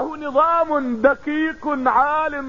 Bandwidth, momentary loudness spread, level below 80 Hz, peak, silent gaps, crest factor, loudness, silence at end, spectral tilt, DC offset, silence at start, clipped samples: 7.2 kHz; 5 LU; -50 dBFS; -4 dBFS; none; 16 dB; -19 LUFS; 0 s; -6 dB/octave; 0.6%; 0 s; under 0.1%